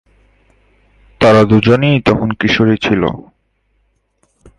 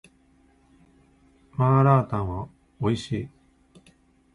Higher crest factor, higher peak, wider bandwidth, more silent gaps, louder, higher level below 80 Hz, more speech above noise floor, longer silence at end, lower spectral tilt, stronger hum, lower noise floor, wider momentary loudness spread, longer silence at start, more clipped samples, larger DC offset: about the same, 14 dB vs 18 dB; first, 0 dBFS vs -8 dBFS; about the same, 10.5 kHz vs 10.5 kHz; neither; first, -12 LUFS vs -24 LUFS; first, -40 dBFS vs -50 dBFS; first, 50 dB vs 38 dB; first, 1.4 s vs 1.05 s; second, -7 dB/octave vs -8.5 dB/octave; neither; about the same, -61 dBFS vs -60 dBFS; second, 7 LU vs 19 LU; second, 1.2 s vs 1.6 s; neither; neither